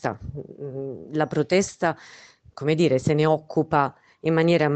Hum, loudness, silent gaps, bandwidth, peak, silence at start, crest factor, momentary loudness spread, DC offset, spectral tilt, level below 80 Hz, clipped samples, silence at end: none; -23 LUFS; none; 8.8 kHz; -6 dBFS; 0.05 s; 18 dB; 15 LU; under 0.1%; -6 dB/octave; -56 dBFS; under 0.1%; 0 s